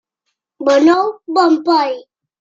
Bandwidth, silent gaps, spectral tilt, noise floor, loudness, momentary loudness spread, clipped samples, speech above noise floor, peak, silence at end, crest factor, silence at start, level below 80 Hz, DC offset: 7.6 kHz; none; -3.5 dB/octave; -74 dBFS; -14 LUFS; 10 LU; under 0.1%; 61 dB; -2 dBFS; 0.4 s; 14 dB; 0.6 s; -66 dBFS; under 0.1%